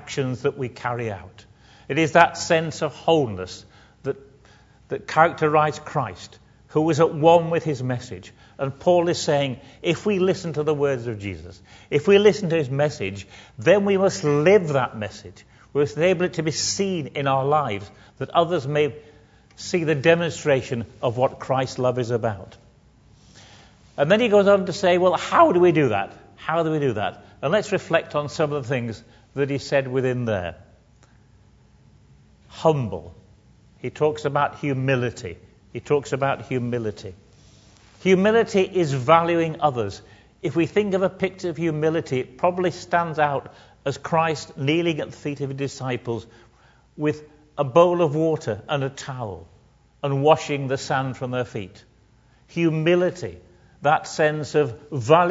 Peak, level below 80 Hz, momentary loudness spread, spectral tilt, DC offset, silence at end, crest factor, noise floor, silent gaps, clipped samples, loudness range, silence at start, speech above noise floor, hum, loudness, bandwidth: 0 dBFS; -58 dBFS; 15 LU; -5.5 dB/octave; under 0.1%; 0 s; 22 dB; -56 dBFS; none; under 0.1%; 6 LU; 0 s; 35 dB; none; -22 LUFS; 8 kHz